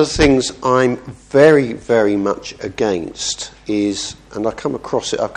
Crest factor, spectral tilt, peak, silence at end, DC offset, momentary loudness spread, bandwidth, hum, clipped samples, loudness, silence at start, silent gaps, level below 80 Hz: 16 dB; -4.5 dB/octave; 0 dBFS; 0 s; under 0.1%; 13 LU; 10.5 kHz; none; under 0.1%; -17 LUFS; 0 s; none; -38 dBFS